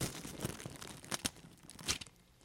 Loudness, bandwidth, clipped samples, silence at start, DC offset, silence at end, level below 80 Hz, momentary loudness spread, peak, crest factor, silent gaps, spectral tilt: -42 LUFS; 16.5 kHz; under 0.1%; 0 s; under 0.1%; 0 s; -60 dBFS; 14 LU; -14 dBFS; 30 dB; none; -2.5 dB/octave